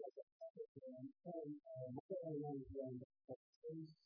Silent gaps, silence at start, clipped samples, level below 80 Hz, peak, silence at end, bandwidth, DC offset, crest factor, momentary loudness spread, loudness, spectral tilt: 0.23-0.40 s, 0.50-0.54 s, 0.68-0.75 s, 2.00-2.09 s, 3.04-3.10 s, 3.24-3.28 s, 3.36-3.62 s; 0 s; under 0.1%; -76 dBFS; -36 dBFS; 0.1 s; 4.9 kHz; under 0.1%; 14 dB; 10 LU; -53 LUFS; -11.5 dB/octave